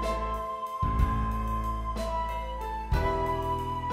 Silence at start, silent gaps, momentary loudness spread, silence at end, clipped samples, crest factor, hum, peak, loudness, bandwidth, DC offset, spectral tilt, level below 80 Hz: 0 s; none; 6 LU; 0 s; under 0.1%; 18 dB; none; -12 dBFS; -31 LUFS; 15 kHz; under 0.1%; -6.5 dB/octave; -34 dBFS